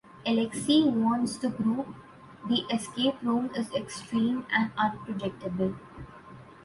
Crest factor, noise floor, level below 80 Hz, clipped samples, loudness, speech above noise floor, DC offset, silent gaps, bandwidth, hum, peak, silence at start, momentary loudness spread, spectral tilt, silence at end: 18 dB; -49 dBFS; -62 dBFS; under 0.1%; -28 LUFS; 21 dB; under 0.1%; none; 11.5 kHz; none; -12 dBFS; 0.15 s; 19 LU; -5 dB/octave; 0.05 s